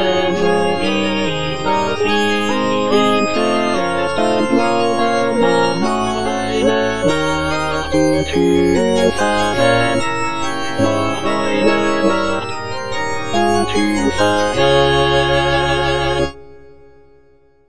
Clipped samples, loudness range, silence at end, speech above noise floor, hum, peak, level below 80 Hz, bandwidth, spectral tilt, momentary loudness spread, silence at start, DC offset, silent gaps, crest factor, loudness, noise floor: under 0.1%; 2 LU; 0 s; 38 dB; none; 0 dBFS; -38 dBFS; 10.5 kHz; -5 dB/octave; 5 LU; 0 s; 4%; none; 14 dB; -16 LUFS; -52 dBFS